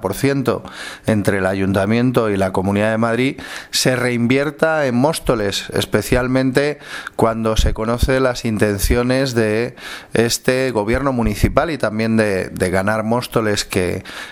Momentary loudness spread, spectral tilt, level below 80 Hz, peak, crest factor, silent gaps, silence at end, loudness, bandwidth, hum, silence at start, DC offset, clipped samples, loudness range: 5 LU; -5 dB/octave; -30 dBFS; 0 dBFS; 18 dB; none; 0 s; -18 LUFS; 17 kHz; none; 0 s; under 0.1%; under 0.1%; 1 LU